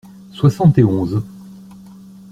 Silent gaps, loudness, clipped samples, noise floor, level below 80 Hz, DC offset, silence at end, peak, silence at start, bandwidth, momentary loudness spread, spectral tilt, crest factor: none; -15 LUFS; under 0.1%; -39 dBFS; -46 dBFS; under 0.1%; 0.8 s; -2 dBFS; 0.35 s; 10 kHz; 19 LU; -9 dB/octave; 16 dB